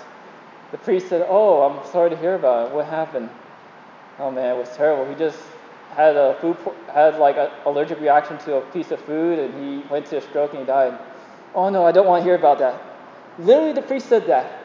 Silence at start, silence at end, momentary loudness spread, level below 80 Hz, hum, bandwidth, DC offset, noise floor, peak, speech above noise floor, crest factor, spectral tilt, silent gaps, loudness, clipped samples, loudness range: 0 s; 0 s; 13 LU; -82 dBFS; none; 7.4 kHz; under 0.1%; -44 dBFS; 0 dBFS; 25 dB; 18 dB; -6.5 dB/octave; none; -19 LUFS; under 0.1%; 5 LU